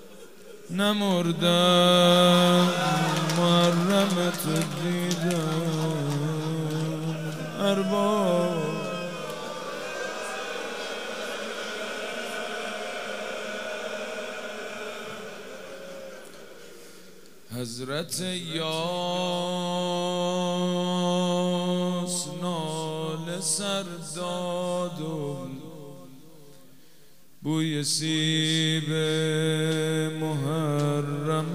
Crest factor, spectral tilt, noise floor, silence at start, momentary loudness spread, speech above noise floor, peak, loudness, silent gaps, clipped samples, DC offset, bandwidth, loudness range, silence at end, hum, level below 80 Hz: 20 dB; -4.5 dB/octave; -58 dBFS; 0 s; 14 LU; 33 dB; -6 dBFS; -26 LUFS; none; under 0.1%; 0.4%; 16 kHz; 13 LU; 0 s; none; -70 dBFS